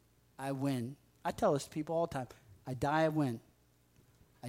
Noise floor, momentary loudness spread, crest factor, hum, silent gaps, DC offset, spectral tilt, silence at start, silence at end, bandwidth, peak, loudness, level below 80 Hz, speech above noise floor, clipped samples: -69 dBFS; 14 LU; 18 dB; none; none; under 0.1%; -6.5 dB/octave; 0.4 s; 0 s; 16 kHz; -18 dBFS; -36 LUFS; -66 dBFS; 34 dB; under 0.1%